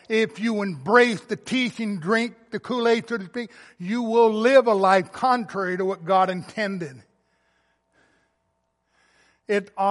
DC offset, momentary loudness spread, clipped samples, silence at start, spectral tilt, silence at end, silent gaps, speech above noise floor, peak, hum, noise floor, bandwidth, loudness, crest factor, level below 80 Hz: under 0.1%; 12 LU; under 0.1%; 0.1 s; -5.5 dB/octave; 0 s; none; 51 dB; -2 dBFS; none; -73 dBFS; 11.5 kHz; -22 LUFS; 20 dB; -74 dBFS